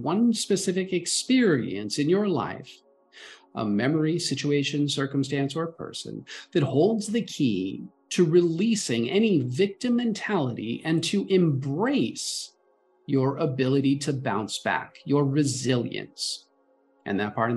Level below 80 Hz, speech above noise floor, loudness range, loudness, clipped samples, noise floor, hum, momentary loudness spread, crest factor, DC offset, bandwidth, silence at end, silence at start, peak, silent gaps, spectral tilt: -70 dBFS; 40 dB; 3 LU; -25 LUFS; under 0.1%; -65 dBFS; none; 11 LU; 16 dB; under 0.1%; 12.5 kHz; 0 s; 0 s; -10 dBFS; none; -5 dB/octave